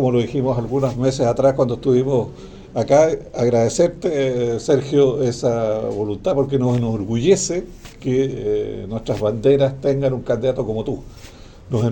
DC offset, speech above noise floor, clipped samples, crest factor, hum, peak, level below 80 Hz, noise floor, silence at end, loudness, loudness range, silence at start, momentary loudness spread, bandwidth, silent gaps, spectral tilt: under 0.1%; 21 dB; under 0.1%; 16 dB; none; -2 dBFS; -42 dBFS; -40 dBFS; 0 s; -19 LUFS; 2 LU; 0 s; 9 LU; 17 kHz; none; -6.5 dB/octave